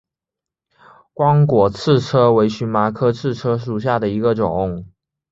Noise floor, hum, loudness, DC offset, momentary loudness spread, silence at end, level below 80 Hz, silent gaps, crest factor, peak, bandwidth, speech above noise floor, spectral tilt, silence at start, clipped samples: -86 dBFS; none; -17 LUFS; under 0.1%; 8 LU; 0.45 s; -46 dBFS; none; 16 dB; -2 dBFS; 7.8 kHz; 70 dB; -8 dB/octave; 1.2 s; under 0.1%